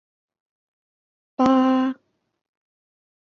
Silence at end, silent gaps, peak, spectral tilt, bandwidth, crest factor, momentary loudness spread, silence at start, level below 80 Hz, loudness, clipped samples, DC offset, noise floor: 1.35 s; none; -6 dBFS; -6 dB/octave; 7 kHz; 20 dB; 20 LU; 1.4 s; -66 dBFS; -20 LUFS; under 0.1%; under 0.1%; -43 dBFS